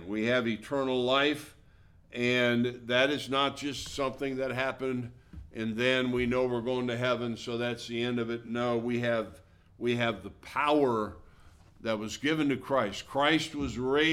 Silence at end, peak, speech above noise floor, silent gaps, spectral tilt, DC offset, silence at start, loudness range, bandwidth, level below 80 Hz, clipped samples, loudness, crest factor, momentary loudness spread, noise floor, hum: 0 s; -10 dBFS; 28 dB; none; -5 dB/octave; under 0.1%; 0 s; 3 LU; 15.5 kHz; -56 dBFS; under 0.1%; -30 LUFS; 20 dB; 9 LU; -58 dBFS; none